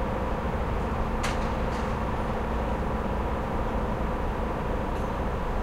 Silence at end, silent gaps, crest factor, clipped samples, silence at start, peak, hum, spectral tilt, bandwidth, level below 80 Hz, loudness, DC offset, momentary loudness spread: 0 s; none; 14 dB; under 0.1%; 0 s; -14 dBFS; none; -7 dB/octave; 15.5 kHz; -32 dBFS; -30 LUFS; under 0.1%; 1 LU